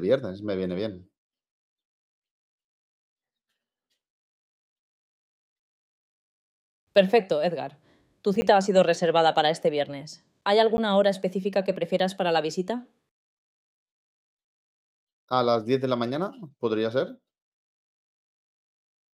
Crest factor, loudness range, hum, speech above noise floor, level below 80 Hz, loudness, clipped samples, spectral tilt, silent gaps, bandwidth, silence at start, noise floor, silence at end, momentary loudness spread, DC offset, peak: 20 dB; 10 LU; none; 60 dB; -66 dBFS; -25 LUFS; under 0.1%; -5.5 dB/octave; 1.18-1.30 s, 1.51-1.76 s, 1.85-2.22 s, 2.31-3.16 s, 4.10-6.87 s, 13.11-14.37 s, 14.44-15.07 s, 15.13-15.28 s; 12.5 kHz; 0 s; -85 dBFS; 2 s; 12 LU; under 0.1%; -6 dBFS